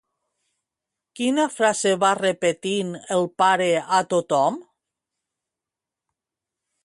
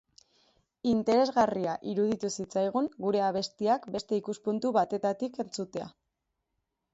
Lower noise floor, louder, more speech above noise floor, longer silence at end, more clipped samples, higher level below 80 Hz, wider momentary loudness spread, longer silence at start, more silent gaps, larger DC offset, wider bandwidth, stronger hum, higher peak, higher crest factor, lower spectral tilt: first, -88 dBFS vs -83 dBFS; first, -21 LUFS vs -30 LUFS; first, 67 dB vs 54 dB; first, 2.2 s vs 1.05 s; neither; about the same, -72 dBFS vs -68 dBFS; second, 6 LU vs 10 LU; first, 1.15 s vs 0.85 s; neither; neither; first, 11.5 kHz vs 8.2 kHz; neither; first, -6 dBFS vs -12 dBFS; about the same, 18 dB vs 20 dB; second, -3.5 dB/octave vs -5.5 dB/octave